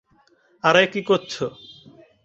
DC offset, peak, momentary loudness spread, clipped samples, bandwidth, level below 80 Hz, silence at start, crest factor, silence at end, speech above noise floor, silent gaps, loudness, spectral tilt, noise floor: under 0.1%; -2 dBFS; 13 LU; under 0.1%; 7.8 kHz; -64 dBFS; 0.65 s; 22 dB; 0.75 s; 40 dB; none; -20 LUFS; -4.5 dB/octave; -60 dBFS